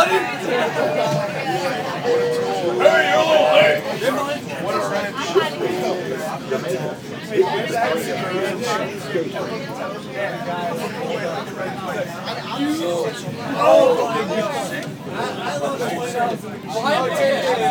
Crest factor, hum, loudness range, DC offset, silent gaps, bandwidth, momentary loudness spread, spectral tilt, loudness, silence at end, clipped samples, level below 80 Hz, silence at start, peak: 20 dB; none; 7 LU; under 0.1%; none; over 20 kHz; 12 LU; -4.5 dB/octave; -20 LUFS; 0 s; under 0.1%; -62 dBFS; 0 s; 0 dBFS